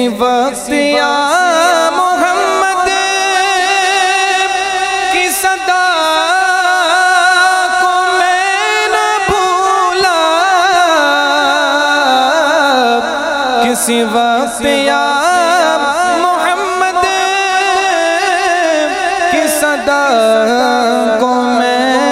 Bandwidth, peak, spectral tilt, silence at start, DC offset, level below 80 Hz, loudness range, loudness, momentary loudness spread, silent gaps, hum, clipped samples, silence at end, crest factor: 16 kHz; 0 dBFS; -1.5 dB/octave; 0 s; under 0.1%; -46 dBFS; 1 LU; -11 LUFS; 3 LU; none; none; under 0.1%; 0 s; 12 dB